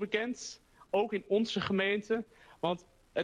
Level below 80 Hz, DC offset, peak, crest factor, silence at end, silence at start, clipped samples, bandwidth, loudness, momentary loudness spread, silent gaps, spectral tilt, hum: -68 dBFS; under 0.1%; -18 dBFS; 16 dB; 0 s; 0 s; under 0.1%; 10 kHz; -33 LUFS; 12 LU; none; -4.5 dB/octave; none